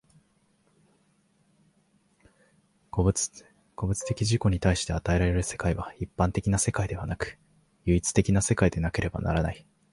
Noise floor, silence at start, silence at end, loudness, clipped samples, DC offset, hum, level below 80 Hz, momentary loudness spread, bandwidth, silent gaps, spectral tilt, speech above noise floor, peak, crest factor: -67 dBFS; 2.95 s; 0.35 s; -27 LUFS; under 0.1%; under 0.1%; none; -40 dBFS; 10 LU; 11.5 kHz; none; -5.5 dB/octave; 41 dB; -8 dBFS; 20 dB